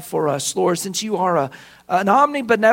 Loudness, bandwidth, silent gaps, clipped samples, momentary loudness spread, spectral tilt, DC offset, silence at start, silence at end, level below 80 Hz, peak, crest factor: -19 LUFS; 16.5 kHz; none; under 0.1%; 7 LU; -4 dB/octave; under 0.1%; 0 s; 0 s; -64 dBFS; 0 dBFS; 18 dB